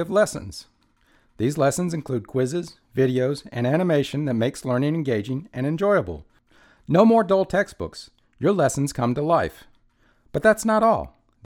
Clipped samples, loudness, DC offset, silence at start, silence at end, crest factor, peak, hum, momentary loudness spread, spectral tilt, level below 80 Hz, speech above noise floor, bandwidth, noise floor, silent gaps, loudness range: under 0.1%; -22 LUFS; under 0.1%; 0 s; 0.4 s; 20 dB; -4 dBFS; none; 13 LU; -6 dB/octave; -50 dBFS; 40 dB; 17 kHz; -61 dBFS; none; 3 LU